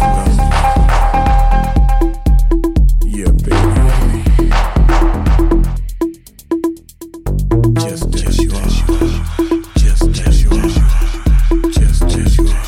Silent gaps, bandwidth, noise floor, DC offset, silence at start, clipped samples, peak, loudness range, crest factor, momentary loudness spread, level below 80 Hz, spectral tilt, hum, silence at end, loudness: none; 14 kHz; -33 dBFS; under 0.1%; 0 s; under 0.1%; 0 dBFS; 3 LU; 10 dB; 6 LU; -12 dBFS; -6.5 dB/octave; none; 0 s; -14 LUFS